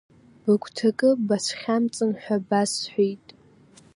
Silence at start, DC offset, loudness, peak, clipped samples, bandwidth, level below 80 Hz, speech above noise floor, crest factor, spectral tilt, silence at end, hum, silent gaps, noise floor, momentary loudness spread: 0.45 s; under 0.1%; -24 LUFS; -8 dBFS; under 0.1%; 11.5 kHz; -70 dBFS; 30 dB; 16 dB; -4.5 dB/octave; 0.8 s; none; none; -54 dBFS; 6 LU